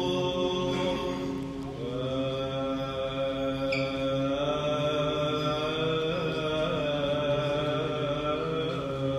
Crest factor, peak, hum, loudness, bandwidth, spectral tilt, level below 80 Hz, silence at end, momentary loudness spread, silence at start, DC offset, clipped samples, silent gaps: 14 dB; -16 dBFS; none; -29 LUFS; 14 kHz; -6 dB/octave; -50 dBFS; 0 s; 4 LU; 0 s; under 0.1%; under 0.1%; none